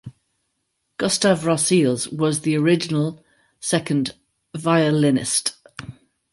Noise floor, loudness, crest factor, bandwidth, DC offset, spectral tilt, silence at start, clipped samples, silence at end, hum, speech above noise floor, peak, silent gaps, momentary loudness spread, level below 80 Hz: -74 dBFS; -20 LUFS; 18 dB; 11.5 kHz; under 0.1%; -4.5 dB/octave; 0.05 s; under 0.1%; 0.4 s; none; 54 dB; -4 dBFS; none; 19 LU; -60 dBFS